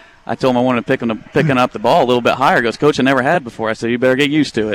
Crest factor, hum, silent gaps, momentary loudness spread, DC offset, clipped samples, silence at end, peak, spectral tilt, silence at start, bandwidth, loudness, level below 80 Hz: 12 dB; none; none; 6 LU; under 0.1%; under 0.1%; 0 s; -4 dBFS; -6 dB/octave; 0.3 s; 16.5 kHz; -15 LUFS; -50 dBFS